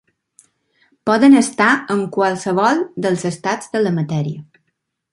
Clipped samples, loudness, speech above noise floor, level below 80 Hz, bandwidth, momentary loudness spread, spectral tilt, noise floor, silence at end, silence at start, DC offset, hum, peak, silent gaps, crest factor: under 0.1%; -16 LUFS; 57 dB; -62 dBFS; 11.5 kHz; 11 LU; -5.5 dB/octave; -73 dBFS; 0.7 s; 1.05 s; under 0.1%; none; -2 dBFS; none; 16 dB